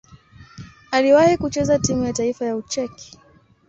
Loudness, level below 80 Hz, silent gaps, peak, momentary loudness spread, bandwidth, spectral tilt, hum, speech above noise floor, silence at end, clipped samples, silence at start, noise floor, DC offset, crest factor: -19 LUFS; -46 dBFS; none; -4 dBFS; 12 LU; 8.2 kHz; -4.5 dB/octave; none; 27 dB; 0.65 s; under 0.1%; 0.4 s; -46 dBFS; under 0.1%; 18 dB